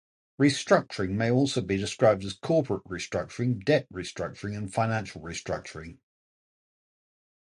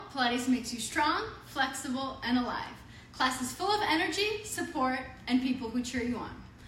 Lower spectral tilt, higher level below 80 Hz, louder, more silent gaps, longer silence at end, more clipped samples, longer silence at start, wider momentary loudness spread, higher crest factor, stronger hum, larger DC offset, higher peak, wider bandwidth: first, -5.5 dB/octave vs -3 dB/octave; about the same, -54 dBFS vs -56 dBFS; first, -28 LUFS vs -31 LUFS; neither; first, 1.65 s vs 0 s; neither; first, 0.4 s vs 0 s; about the same, 12 LU vs 10 LU; about the same, 22 dB vs 18 dB; neither; neither; first, -6 dBFS vs -14 dBFS; second, 11.5 kHz vs 16 kHz